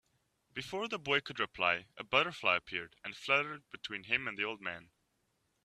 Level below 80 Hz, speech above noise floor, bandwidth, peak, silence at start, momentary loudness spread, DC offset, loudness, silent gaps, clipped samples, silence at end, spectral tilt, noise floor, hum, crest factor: -72 dBFS; 43 dB; 14 kHz; -12 dBFS; 0.55 s; 13 LU; under 0.1%; -34 LUFS; none; under 0.1%; 0.8 s; -3.5 dB/octave; -79 dBFS; none; 24 dB